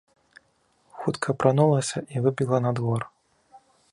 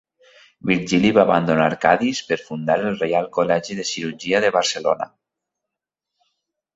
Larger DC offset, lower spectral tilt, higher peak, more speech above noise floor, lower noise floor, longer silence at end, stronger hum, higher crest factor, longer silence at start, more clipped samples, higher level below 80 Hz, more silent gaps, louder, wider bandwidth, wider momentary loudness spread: neither; first, -6.5 dB/octave vs -4.5 dB/octave; about the same, -4 dBFS vs -2 dBFS; second, 43 dB vs 65 dB; second, -66 dBFS vs -84 dBFS; second, 0.35 s vs 1.7 s; neither; about the same, 22 dB vs 20 dB; first, 0.95 s vs 0.65 s; neither; second, -64 dBFS vs -58 dBFS; neither; second, -24 LUFS vs -20 LUFS; first, 11.5 kHz vs 8 kHz; about the same, 10 LU vs 9 LU